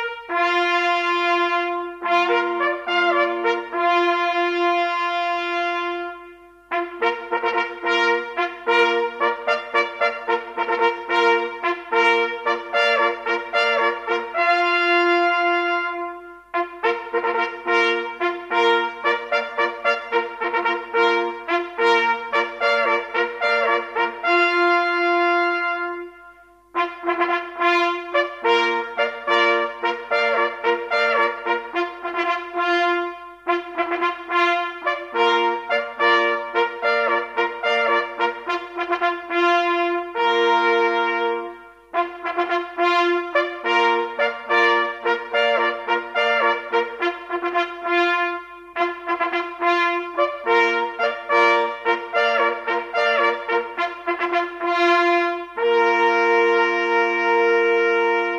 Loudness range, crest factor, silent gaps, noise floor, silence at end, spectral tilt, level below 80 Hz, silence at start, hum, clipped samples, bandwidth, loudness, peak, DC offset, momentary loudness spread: 3 LU; 18 dB; none; -48 dBFS; 0 s; -2.5 dB/octave; -64 dBFS; 0 s; none; under 0.1%; 8.4 kHz; -20 LUFS; -4 dBFS; under 0.1%; 8 LU